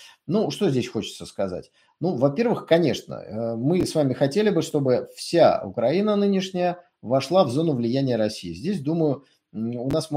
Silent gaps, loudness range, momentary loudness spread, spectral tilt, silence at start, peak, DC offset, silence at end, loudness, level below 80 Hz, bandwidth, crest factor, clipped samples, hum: none; 3 LU; 11 LU; -6.5 dB/octave; 0 s; -6 dBFS; under 0.1%; 0 s; -23 LUFS; -58 dBFS; 16 kHz; 18 dB; under 0.1%; none